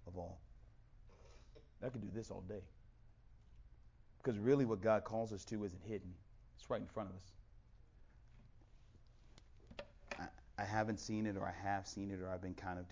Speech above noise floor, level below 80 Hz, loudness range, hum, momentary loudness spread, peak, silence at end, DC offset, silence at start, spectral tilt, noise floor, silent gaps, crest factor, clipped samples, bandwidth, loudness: 22 dB; -62 dBFS; 12 LU; none; 23 LU; -22 dBFS; 0 s; under 0.1%; 0 s; -6.5 dB/octave; -64 dBFS; none; 22 dB; under 0.1%; 7.6 kHz; -43 LUFS